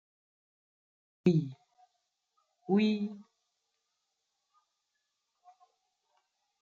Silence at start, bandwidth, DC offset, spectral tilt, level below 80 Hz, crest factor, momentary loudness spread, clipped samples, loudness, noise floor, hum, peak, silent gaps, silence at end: 1.25 s; 7.2 kHz; under 0.1%; -7.5 dB/octave; -78 dBFS; 24 dB; 20 LU; under 0.1%; -31 LUFS; -83 dBFS; none; -14 dBFS; none; 3.4 s